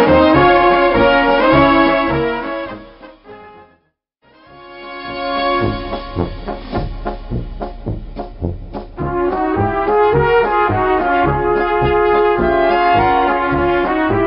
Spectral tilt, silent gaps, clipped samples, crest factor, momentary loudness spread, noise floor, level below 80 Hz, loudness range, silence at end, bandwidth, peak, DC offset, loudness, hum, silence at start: -4.5 dB/octave; none; under 0.1%; 16 dB; 16 LU; -62 dBFS; -32 dBFS; 11 LU; 0 s; 5.6 kHz; 0 dBFS; under 0.1%; -14 LUFS; none; 0 s